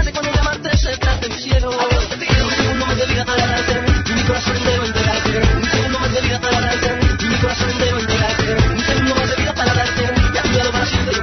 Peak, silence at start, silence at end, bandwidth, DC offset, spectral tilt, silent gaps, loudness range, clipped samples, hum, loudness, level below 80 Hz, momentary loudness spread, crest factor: 0 dBFS; 0 s; 0 s; 6.4 kHz; under 0.1%; -4.5 dB/octave; none; 1 LU; under 0.1%; none; -16 LUFS; -24 dBFS; 2 LU; 16 dB